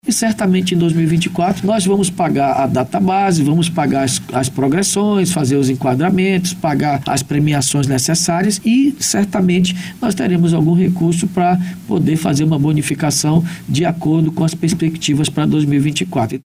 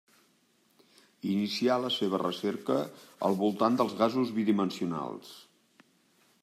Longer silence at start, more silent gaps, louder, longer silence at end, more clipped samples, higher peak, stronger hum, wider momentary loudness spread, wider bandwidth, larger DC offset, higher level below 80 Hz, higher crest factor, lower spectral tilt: second, 0.05 s vs 1.25 s; neither; first, -15 LUFS vs -30 LUFS; second, 0.05 s vs 1 s; neither; first, -2 dBFS vs -12 dBFS; neither; second, 3 LU vs 11 LU; first, 16 kHz vs 14.5 kHz; neither; first, -46 dBFS vs -80 dBFS; second, 12 dB vs 20 dB; about the same, -5.5 dB/octave vs -6 dB/octave